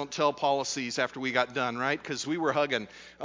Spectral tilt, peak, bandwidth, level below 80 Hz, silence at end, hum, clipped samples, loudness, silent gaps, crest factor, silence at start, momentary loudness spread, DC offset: -3.5 dB/octave; -10 dBFS; 7.6 kHz; -70 dBFS; 0 s; none; under 0.1%; -29 LUFS; none; 20 dB; 0 s; 5 LU; under 0.1%